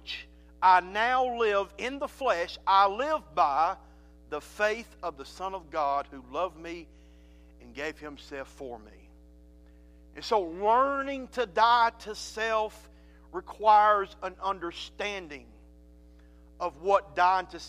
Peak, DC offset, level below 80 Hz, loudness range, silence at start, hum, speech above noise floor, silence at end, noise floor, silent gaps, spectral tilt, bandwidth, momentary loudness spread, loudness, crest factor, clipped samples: -8 dBFS; under 0.1%; -54 dBFS; 11 LU; 0.05 s; none; 26 dB; 0 s; -54 dBFS; none; -3.5 dB/octave; 15 kHz; 19 LU; -28 LUFS; 20 dB; under 0.1%